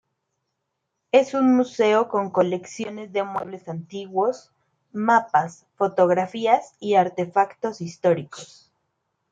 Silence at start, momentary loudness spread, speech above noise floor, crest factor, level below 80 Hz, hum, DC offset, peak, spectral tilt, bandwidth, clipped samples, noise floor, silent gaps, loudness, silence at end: 1.15 s; 14 LU; 57 dB; 20 dB; -74 dBFS; none; under 0.1%; -4 dBFS; -6 dB/octave; 9 kHz; under 0.1%; -78 dBFS; none; -22 LUFS; 0.85 s